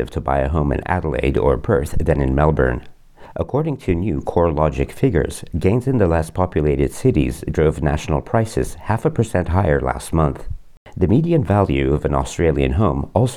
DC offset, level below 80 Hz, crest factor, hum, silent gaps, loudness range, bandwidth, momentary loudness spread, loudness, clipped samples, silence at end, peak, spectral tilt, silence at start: under 0.1%; -30 dBFS; 16 dB; none; 10.77-10.86 s; 1 LU; 14.5 kHz; 5 LU; -19 LUFS; under 0.1%; 0 s; -2 dBFS; -7.5 dB/octave; 0 s